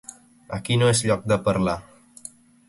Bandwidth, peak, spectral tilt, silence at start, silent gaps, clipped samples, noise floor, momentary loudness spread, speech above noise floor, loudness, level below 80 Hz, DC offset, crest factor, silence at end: 11.5 kHz; -8 dBFS; -5 dB/octave; 0.5 s; none; under 0.1%; -46 dBFS; 22 LU; 24 dB; -22 LUFS; -48 dBFS; under 0.1%; 18 dB; 0.4 s